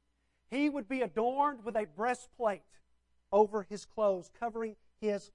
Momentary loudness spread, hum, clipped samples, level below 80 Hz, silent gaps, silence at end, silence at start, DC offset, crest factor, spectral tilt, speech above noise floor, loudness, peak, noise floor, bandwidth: 10 LU; none; under 0.1%; -70 dBFS; none; 0.1 s; 0.5 s; under 0.1%; 22 dB; -5.5 dB/octave; 41 dB; -34 LUFS; -14 dBFS; -74 dBFS; 11 kHz